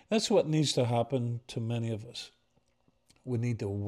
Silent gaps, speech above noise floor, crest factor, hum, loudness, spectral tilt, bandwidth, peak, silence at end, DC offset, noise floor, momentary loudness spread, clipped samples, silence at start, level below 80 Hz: none; 42 dB; 16 dB; none; -31 LUFS; -5.5 dB/octave; 12.5 kHz; -16 dBFS; 0 s; under 0.1%; -73 dBFS; 16 LU; under 0.1%; 0.1 s; -70 dBFS